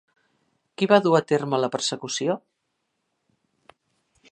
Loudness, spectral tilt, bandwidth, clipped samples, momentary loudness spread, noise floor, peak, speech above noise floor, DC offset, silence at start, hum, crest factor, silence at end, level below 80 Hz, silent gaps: -23 LUFS; -4.5 dB/octave; 11.5 kHz; under 0.1%; 10 LU; -77 dBFS; -2 dBFS; 55 dB; under 0.1%; 0.8 s; none; 22 dB; 1.95 s; -76 dBFS; none